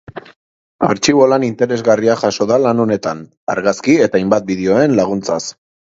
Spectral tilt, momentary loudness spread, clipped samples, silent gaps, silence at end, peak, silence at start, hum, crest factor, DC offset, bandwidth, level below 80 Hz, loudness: -5 dB/octave; 10 LU; under 0.1%; 0.36-0.79 s, 3.37-3.47 s; 0.45 s; 0 dBFS; 0.15 s; none; 14 dB; under 0.1%; 7.8 kHz; -52 dBFS; -14 LUFS